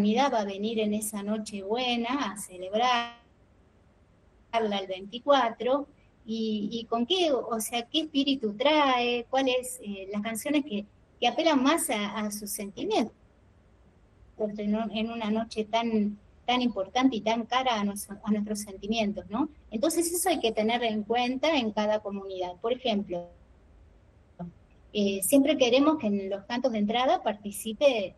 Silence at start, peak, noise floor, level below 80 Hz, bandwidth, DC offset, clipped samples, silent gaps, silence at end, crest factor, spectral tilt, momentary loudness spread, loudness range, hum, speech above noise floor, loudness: 0 s; -10 dBFS; -61 dBFS; -60 dBFS; 13 kHz; under 0.1%; under 0.1%; none; 0.05 s; 18 dB; -4 dB/octave; 11 LU; 5 LU; none; 33 dB; -28 LUFS